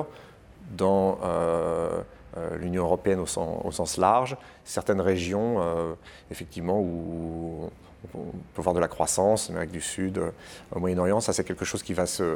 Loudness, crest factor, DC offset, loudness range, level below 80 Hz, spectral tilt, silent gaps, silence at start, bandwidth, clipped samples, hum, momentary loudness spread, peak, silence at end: -27 LUFS; 22 dB; under 0.1%; 4 LU; -50 dBFS; -5 dB/octave; none; 0 s; 19.5 kHz; under 0.1%; none; 15 LU; -6 dBFS; 0 s